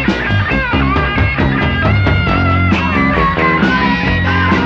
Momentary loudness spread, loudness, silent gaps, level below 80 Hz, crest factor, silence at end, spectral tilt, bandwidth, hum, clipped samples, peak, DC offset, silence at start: 2 LU; -13 LUFS; none; -24 dBFS; 12 dB; 0 s; -7.5 dB/octave; 7 kHz; none; under 0.1%; 0 dBFS; under 0.1%; 0 s